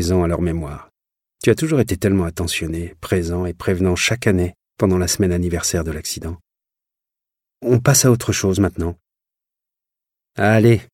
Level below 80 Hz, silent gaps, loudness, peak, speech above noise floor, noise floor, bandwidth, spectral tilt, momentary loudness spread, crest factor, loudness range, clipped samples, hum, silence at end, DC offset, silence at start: -38 dBFS; none; -18 LUFS; -2 dBFS; 68 dB; -86 dBFS; 16.5 kHz; -5 dB/octave; 13 LU; 16 dB; 2 LU; under 0.1%; none; 0.1 s; under 0.1%; 0 s